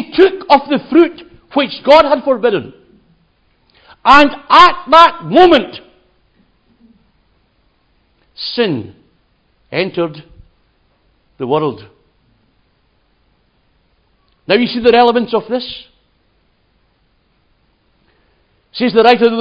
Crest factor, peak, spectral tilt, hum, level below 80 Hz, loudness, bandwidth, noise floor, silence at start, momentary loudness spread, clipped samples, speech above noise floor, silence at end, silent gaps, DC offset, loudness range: 14 dB; 0 dBFS; -5.5 dB/octave; none; -48 dBFS; -11 LUFS; 8 kHz; -58 dBFS; 0 s; 19 LU; 0.5%; 47 dB; 0 s; none; under 0.1%; 15 LU